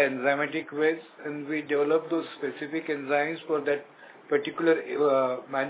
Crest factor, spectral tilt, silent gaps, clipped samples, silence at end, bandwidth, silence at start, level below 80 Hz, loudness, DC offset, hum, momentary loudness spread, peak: 18 dB; -9 dB/octave; none; under 0.1%; 0 s; 4 kHz; 0 s; -84 dBFS; -28 LUFS; under 0.1%; none; 9 LU; -10 dBFS